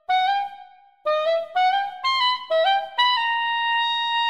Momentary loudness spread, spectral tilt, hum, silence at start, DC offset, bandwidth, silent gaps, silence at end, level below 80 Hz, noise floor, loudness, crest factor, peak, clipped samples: 4 LU; 0.5 dB/octave; none; 0.1 s; 0.2%; 11.5 kHz; none; 0 s; -74 dBFS; -47 dBFS; -21 LUFS; 14 dB; -8 dBFS; under 0.1%